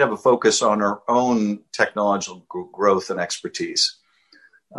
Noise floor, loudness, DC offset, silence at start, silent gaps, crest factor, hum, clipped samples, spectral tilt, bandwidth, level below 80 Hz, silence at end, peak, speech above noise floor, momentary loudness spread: -55 dBFS; -21 LUFS; under 0.1%; 0 s; none; 18 dB; none; under 0.1%; -3 dB/octave; 12 kHz; -64 dBFS; 0 s; -4 dBFS; 35 dB; 9 LU